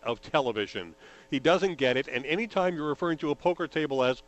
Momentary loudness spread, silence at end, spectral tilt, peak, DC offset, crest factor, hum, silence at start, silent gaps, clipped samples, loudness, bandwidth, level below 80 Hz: 8 LU; 0.05 s; -5.5 dB/octave; -8 dBFS; under 0.1%; 20 dB; none; 0.05 s; none; under 0.1%; -28 LUFS; 8.4 kHz; -60 dBFS